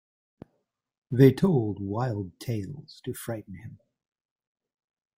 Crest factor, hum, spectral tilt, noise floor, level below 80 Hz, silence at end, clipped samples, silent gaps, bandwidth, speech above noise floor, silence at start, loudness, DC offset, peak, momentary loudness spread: 24 dB; none; -8 dB/octave; -77 dBFS; -62 dBFS; 1.45 s; under 0.1%; none; 16.5 kHz; 51 dB; 1.1 s; -26 LUFS; under 0.1%; -6 dBFS; 20 LU